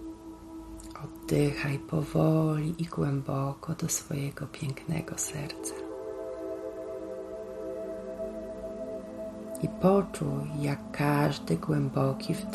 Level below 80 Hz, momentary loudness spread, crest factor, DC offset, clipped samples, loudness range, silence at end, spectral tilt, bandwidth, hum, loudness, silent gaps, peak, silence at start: -54 dBFS; 13 LU; 20 dB; under 0.1%; under 0.1%; 9 LU; 0 s; -6 dB/octave; 13.5 kHz; none; -31 LUFS; none; -12 dBFS; 0 s